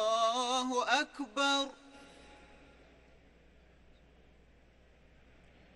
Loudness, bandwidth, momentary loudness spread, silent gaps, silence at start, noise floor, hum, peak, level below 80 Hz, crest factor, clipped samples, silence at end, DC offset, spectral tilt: -32 LUFS; 11.5 kHz; 25 LU; none; 0 s; -63 dBFS; none; -16 dBFS; -66 dBFS; 22 dB; under 0.1%; 3.4 s; under 0.1%; -1 dB/octave